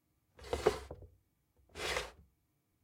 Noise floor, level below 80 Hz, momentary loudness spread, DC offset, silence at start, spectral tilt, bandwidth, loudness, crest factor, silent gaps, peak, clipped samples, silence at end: -79 dBFS; -56 dBFS; 20 LU; under 0.1%; 0.4 s; -3.5 dB/octave; 16.5 kHz; -38 LUFS; 28 dB; none; -14 dBFS; under 0.1%; 0.6 s